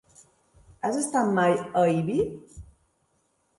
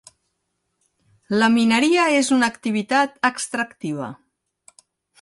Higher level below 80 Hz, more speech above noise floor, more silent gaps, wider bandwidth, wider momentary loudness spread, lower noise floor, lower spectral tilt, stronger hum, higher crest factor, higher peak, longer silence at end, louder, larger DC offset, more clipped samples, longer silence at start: first, -56 dBFS vs -66 dBFS; second, 46 dB vs 55 dB; neither; about the same, 11.5 kHz vs 11.5 kHz; about the same, 10 LU vs 12 LU; second, -71 dBFS vs -75 dBFS; first, -5.5 dB/octave vs -3.5 dB/octave; neither; about the same, 18 dB vs 18 dB; second, -10 dBFS vs -4 dBFS; about the same, 0.95 s vs 1.05 s; second, -25 LUFS vs -19 LUFS; neither; neither; second, 0.85 s vs 1.3 s